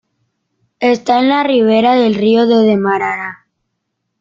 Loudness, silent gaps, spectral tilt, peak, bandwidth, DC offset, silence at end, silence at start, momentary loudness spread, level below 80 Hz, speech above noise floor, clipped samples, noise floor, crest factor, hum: -12 LUFS; none; -6.5 dB/octave; -2 dBFS; 7.4 kHz; under 0.1%; 0.85 s; 0.8 s; 7 LU; -58 dBFS; 60 dB; under 0.1%; -72 dBFS; 12 dB; none